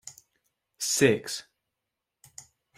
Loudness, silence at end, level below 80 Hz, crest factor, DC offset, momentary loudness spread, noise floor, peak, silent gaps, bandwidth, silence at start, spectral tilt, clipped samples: -26 LUFS; 0.35 s; -68 dBFS; 24 dB; under 0.1%; 26 LU; -85 dBFS; -8 dBFS; none; 16 kHz; 0.05 s; -3.5 dB/octave; under 0.1%